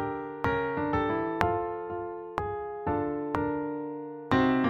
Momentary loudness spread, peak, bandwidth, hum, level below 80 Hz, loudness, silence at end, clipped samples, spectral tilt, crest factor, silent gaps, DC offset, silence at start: 8 LU; -4 dBFS; 8.6 kHz; none; -50 dBFS; -31 LUFS; 0 s; under 0.1%; -8 dB/octave; 26 dB; none; under 0.1%; 0 s